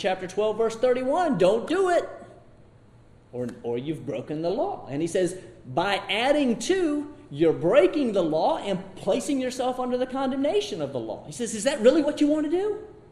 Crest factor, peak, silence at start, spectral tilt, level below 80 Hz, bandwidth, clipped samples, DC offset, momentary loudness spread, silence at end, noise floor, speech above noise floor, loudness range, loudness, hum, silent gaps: 20 dB; -6 dBFS; 0 s; -5 dB/octave; -56 dBFS; 12.5 kHz; under 0.1%; under 0.1%; 12 LU; 0.1 s; -53 dBFS; 28 dB; 6 LU; -25 LUFS; none; none